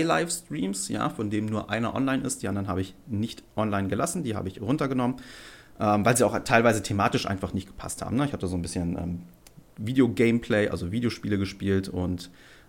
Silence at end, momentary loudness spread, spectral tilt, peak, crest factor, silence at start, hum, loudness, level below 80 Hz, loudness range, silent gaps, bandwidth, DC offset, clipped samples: 0.15 s; 11 LU; -5.5 dB/octave; -6 dBFS; 22 dB; 0 s; none; -27 LUFS; -52 dBFS; 4 LU; none; 17 kHz; under 0.1%; under 0.1%